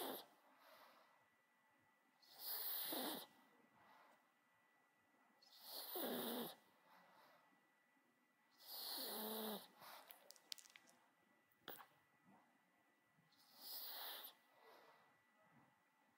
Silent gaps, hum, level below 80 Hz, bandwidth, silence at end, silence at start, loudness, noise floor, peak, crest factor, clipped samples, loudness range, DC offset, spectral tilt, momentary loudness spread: none; none; under -90 dBFS; 16 kHz; 0.5 s; 0 s; -50 LUFS; -80 dBFS; -26 dBFS; 30 dB; under 0.1%; 9 LU; under 0.1%; -2 dB/octave; 23 LU